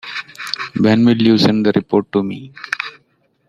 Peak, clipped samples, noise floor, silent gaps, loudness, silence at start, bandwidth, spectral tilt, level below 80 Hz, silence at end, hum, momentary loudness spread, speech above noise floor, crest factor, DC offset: -2 dBFS; under 0.1%; -60 dBFS; none; -16 LUFS; 0.05 s; 13 kHz; -6.5 dB/octave; -54 dBFS; 0.6 s; none; 14 LU; 46 dB; 16 dB; under 0.1%